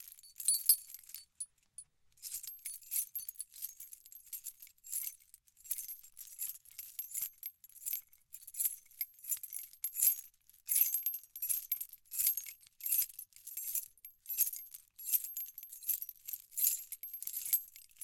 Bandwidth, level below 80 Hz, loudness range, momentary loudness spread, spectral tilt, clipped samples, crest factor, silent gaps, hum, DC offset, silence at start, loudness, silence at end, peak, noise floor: 17 kHz; -82 dBFS; 9 LU; 20 LU; 4.5 dB/octave; under 0.1%; 28 dB; none; none; under 0.1%; 0 s; -36 LUFS; 0 s; -12 dBFS; -64 dBFS